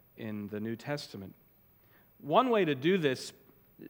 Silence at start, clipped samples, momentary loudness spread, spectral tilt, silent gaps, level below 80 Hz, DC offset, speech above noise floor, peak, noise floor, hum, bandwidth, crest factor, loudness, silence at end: 0.15 s; under 0.1%; 19 LU; -6 dB/octave; none; -78 dBFS; under 0.1%; 32 dB; -12 dBFS; -63 dBFS; none; 19 kHz; 22 dB; -31 LUFS; 0 s